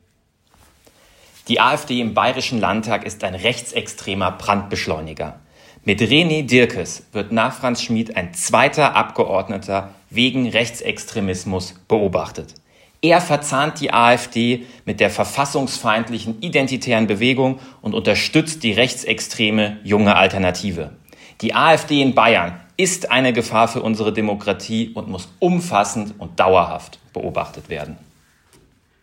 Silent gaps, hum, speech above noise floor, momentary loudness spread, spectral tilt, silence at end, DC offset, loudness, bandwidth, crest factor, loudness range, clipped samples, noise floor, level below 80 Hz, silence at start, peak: none; none; 43 dB; 12 LU; -4 dB/octave; 1.05 s; under 0.1%; -18 LUFS; 16.5 kHz; 18 dB; 4 LU; under 0.1%; -61 dBFS; -54 dBFS; 1.45 s; 0 dBFS